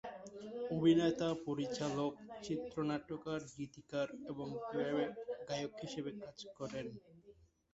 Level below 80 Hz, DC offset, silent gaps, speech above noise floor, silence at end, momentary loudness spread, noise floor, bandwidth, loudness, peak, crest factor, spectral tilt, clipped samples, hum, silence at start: -72 dBFS; under 0.1%; none; 26 dB; 0.4 s; 16 LU; -65 dBFS; 8 kHz; -40 LUFS; -20 dBFS; 20 dB; -5.5 dB/octave; under 0.1%; none; 0.05 s